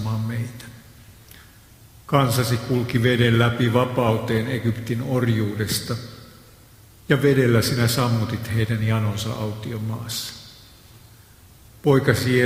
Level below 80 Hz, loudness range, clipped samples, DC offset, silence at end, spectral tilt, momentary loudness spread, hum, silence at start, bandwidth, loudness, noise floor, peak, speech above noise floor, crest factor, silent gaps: -48 dBFS; 5 LU; under 0.1%; under 0.1%; 0 s; -6 dB/octave; 11 LU; none; 0 s; 16 kHz; -22 LUFS; -49 dBFS; -2 dBFS; 28 dB; 20 dB; none